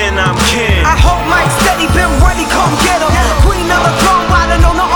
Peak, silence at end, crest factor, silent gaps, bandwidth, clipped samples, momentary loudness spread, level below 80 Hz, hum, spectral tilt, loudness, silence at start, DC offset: 0 dBFS; 0 s; 10 dB; none; over 20 kHz; under 0.1%; 2 LU; -14 dBFS; none; -4.5 dB/octave; -10 LUFS; 0 s; under 0.1%